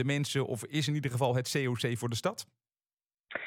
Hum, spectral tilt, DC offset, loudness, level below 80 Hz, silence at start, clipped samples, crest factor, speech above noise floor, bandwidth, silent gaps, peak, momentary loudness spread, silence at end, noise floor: none; -5 dB/octave; under 0.1%; -32 LUFS; -74 dBFS; 0 s; under 0.1%; 18 dB; over 58 dB; 17 kHz; 3.06-3.10 s, 3.20-3.24 s; -14 dBFS; 9 LU; 0 s; under -90 dBFS